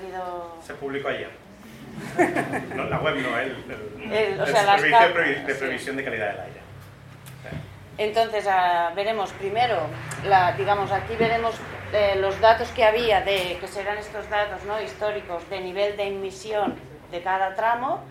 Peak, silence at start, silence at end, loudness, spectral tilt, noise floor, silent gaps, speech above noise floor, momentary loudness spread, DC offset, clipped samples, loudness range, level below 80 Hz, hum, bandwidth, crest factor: -4 dBFS; 0 s; 0 s; -23 LUFS; -4.5 dB/octave; -44 dBFS; none; 20 dB; 18 LU; under 0.1%; under 0.1%; 6 LU; -52 dBFS; none; 16 kHz; 22 dB